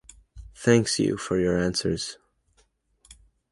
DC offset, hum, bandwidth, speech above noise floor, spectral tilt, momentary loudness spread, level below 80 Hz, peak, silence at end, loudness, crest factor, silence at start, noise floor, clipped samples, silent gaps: under 0.1%; none; 11.5 kHz; 43 dB; -5 dB/octave; 9 LU; -50 dBFS; -4 dBFS; 0.4 s; -24 LUFS; 22 dB; 0.35 s; -66 dBFS; under 0.1%; none